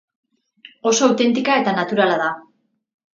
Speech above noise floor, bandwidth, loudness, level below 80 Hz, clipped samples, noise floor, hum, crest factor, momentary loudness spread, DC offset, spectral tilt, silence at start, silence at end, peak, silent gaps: 31 dB; 7.8 kHz; -18 LUFS; -70 dBFS; under 0.1%; -48 dBFS; none; 20 dB; 9 LU; under 0.1%; -3.5 dB/octave; 0.85 s; 0.75 s; 0 dBFS; none